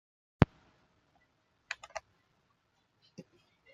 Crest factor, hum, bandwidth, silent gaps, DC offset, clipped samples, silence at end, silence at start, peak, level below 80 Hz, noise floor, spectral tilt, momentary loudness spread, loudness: 36 dB; none; 7.8 kHz; none; under 0.1%; under 0.1%; 1.75 s; 0.4 s; -4 dBFS; -52 dBFS; -75 dBFS; -7 dB/octave; 26 LU; -34 LUFS